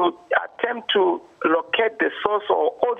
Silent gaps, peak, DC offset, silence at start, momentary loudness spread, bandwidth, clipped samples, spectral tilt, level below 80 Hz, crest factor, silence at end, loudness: none; 0 dBFS; under 0.1%; 0 s; 4 LU; 4.2 kHz; under 0.1%; -5.5 dB/octave; -66 dBFS; 20 dB; 0 s; -22 LUFS